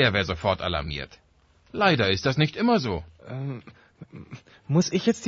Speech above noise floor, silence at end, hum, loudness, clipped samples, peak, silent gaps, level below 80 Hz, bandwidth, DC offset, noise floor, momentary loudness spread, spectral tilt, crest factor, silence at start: 35 dB; 0 s; none; -25 LUFS; under 0.1%; -6 dBFS; none; -48 dBFS; 8 kHz; under 0.1%; -60 dBFS; 21 LU; -5.5 dB/octave; 18 dB; 0 s